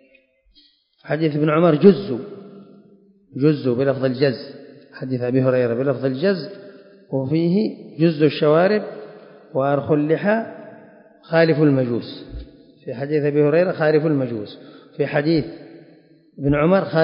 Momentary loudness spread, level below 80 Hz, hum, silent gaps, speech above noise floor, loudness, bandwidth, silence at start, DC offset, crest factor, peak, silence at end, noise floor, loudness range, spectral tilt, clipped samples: 20 LU; -50 dBFS; none; none; 39 dB; -19 LUFS; 5.4 kHz; 1.05 s; under 0.1%; 20 dB; 0 dBFS; 0 s; -57 dBFS; 3 LU; -12 dB/octave; under 0.1%